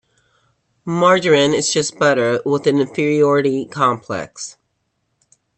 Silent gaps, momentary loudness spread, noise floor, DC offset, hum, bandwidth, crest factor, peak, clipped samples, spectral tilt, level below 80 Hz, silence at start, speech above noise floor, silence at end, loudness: none; 13 LU; -70 dBFS; under 0.1%; none; 8.8 kHz; 16 dB; -2 dBFS; under 0.1%; -4.5 dB/octave; -60 dBFS; 0.85 s; 54 dB; 1.05 s; -16 LUFS